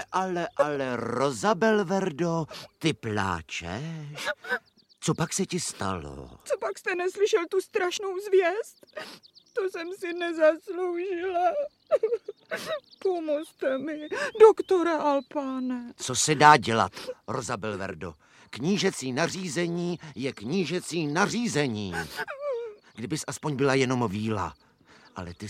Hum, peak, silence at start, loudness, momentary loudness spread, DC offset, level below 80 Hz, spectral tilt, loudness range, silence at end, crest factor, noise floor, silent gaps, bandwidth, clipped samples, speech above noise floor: none; -2 dBFS; 0 s; -27 LUFS; 12 LU; under 0.1%; -62 dBFS; -4.5 dB/octave; 6 LU; 0 s; 24 dB; -57 dBFS; none; 15 kHz; under 0.1%; 30 dB